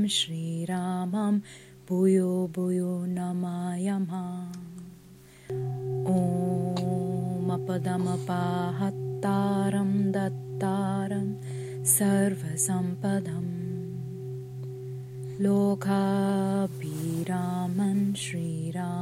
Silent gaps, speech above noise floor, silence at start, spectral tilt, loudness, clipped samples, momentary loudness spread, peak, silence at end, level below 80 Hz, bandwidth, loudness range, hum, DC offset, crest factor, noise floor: none; 24 dB; 0 s; -5.5 dB/octave; -28 LUFS; under 0.1%; 13 LU; -8 dBFS; 0 s; -64 dBFS; 15.5 kHz; 4 LU; none; under 0.1%; 20 dB; -51 dBFS